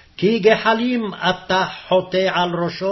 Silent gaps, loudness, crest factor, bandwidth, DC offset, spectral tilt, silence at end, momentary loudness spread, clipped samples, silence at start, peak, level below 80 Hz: none; -18 LUFS; 18 dB; 6.2 kHz; under 0.1%; -5.5 dB/octave; 0 s; 6 LU; under 0.1%; 0.2 s; 0 dBFS; -54 dBFS